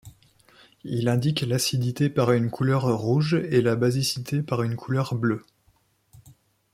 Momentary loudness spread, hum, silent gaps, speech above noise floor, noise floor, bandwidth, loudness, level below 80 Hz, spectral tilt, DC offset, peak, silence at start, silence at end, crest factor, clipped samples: 5 LU; none; none; 41 dB; -65 dBFS; 15.5 kHz; -24 LUFS; -60 dBFS; -6 dB/octave; under 0.1%; -8 dBFS; 0.05 s; 0.45 s; 18 dB; under 0.1%